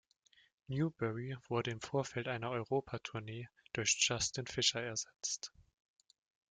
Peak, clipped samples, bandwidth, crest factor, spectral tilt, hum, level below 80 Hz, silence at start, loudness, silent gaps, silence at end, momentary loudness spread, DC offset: -18 dBFS; under 0.1%; 10.5 kHz; 22 dB; -3 dB/octave; none; -70 dBFS; 0.7 s; -37 LUFS; none; 0.9 s; 12 LU; under 0.1%